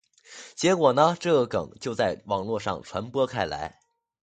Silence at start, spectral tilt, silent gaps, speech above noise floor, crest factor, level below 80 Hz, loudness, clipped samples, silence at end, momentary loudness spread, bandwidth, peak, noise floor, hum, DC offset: 0.3 s; -5 dB/octave; none; 23 dB; 22 dB; -56 dBFS; -25 LUFS; under 0.1%; 0.55 s; 13 LU; 9.4 kHz; -4 dBFS; -48 dBFS; none; under 0.1%